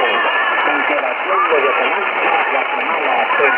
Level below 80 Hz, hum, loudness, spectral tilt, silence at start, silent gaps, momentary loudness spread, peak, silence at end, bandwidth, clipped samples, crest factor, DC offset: -66 dBFS; none; -15 LUFS; -5 dB/octave; 0 s; none; 3 LU; 0 dBFS; 0 s; 5.6 kHz; under 0.1%; 16 dB; under 0.1%